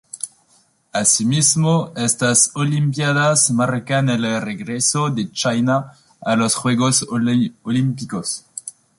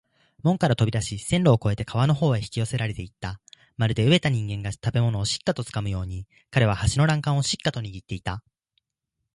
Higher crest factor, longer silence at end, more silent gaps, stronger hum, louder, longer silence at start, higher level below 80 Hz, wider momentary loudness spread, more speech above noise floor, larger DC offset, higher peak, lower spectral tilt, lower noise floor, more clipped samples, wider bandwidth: about the same, 18 dB vs 18 dB; second, 0.3 s vs 0.95 s; neither; neither; first, -17 LUFS vs -24 LUFS; second, 0.15 s vs 0.45 s; second, -58 dBFS vs -44 dBFS; about the same, 12 LU vs 14 LU; second, 40 dB vs 58 dB; neither; first, 0 dBFS vs -6 dBFS; second, -4 dB/octave vs -5.5 dB/octave; second, -58 dBFS vs -82 dBFS; neither; about the same, 11.5 kHz vs 11.5 kHz